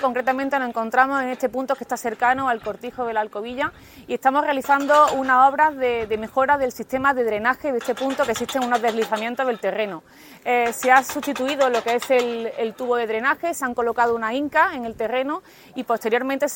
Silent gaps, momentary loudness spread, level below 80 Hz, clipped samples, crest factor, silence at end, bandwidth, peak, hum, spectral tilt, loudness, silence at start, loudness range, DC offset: none; 10 LU; -58 dBFS; under 0.1%; 20 dB; 0 s; 17 kHz; -2 dBFS; none; -3.5 dB/octave; -21 LUFS; 0 s; 4 LU; under 0.1%